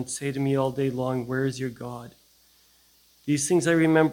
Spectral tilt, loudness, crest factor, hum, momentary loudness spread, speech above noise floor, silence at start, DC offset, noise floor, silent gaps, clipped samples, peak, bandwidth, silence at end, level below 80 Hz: -5.5 dB/octave; -25 LUFS; 20 dB; none; 17 LU; 36 dB; 0 s; under 0.1%; -60 dBFS; none; under 0.1%; -6 dBFS; 17 kHz; 0 s; -60 dBFS